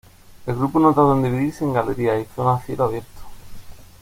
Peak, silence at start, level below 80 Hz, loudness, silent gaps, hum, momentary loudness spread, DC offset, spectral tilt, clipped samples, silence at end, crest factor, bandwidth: -2 dBFS; 0.35 s; -46 dBFS; -20 LUFS; none; none; 10 LU; under 0.1%; -8.5 dB/octave; under 0.1%; 0.2 s; 18 dB; 16.5 kHz